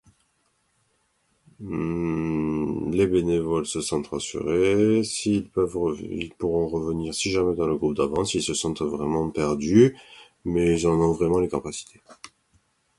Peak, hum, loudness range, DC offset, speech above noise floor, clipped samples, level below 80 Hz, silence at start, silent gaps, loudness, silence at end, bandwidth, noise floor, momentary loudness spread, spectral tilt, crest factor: -4 dBFS; none; 3 LU; under 0.1%; 46 dB; under 0.1%; -46 dBFS; 1.6 s; none; -24 LUFS; 0.7 s; 11.5 kHz; -69 dBFS; 9 LU; -5.5 dB/octave; 20 dB